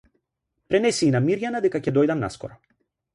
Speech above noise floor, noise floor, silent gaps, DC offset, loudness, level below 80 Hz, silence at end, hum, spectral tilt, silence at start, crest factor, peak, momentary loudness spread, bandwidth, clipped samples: 56 dB; -78 dBFS; none; under 0.1%; -22 LUFS; -58 dBFS; 0.6 s; none; -6 dB/octave; 0.7 s; 16 dB; -8 dBFS; 11 LU; 11.5 kHz; under 0.1%